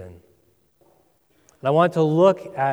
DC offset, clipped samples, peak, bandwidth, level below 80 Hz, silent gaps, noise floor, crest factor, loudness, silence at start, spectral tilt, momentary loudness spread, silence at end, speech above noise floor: under 0.1%; under 0.1%; -4 dBFS; 11.5 kHz; -66 dBFS; none; -63 dBFS; 18 dB; -19 LUFS; 0 s; -7.5 dB/octave; 7 LU; 0 s; 44 dB